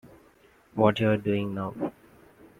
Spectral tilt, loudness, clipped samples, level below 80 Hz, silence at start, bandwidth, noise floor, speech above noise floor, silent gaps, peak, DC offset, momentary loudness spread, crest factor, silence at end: -8 dB/octave; -27 LUFS; under 0.1%; -62 dBFS; 0.05 s; 15 kHz; -59 dBFS; 33 dB; none; -6 dBFS; under 0.1%; 13 LU; 24 dB; 0.7 s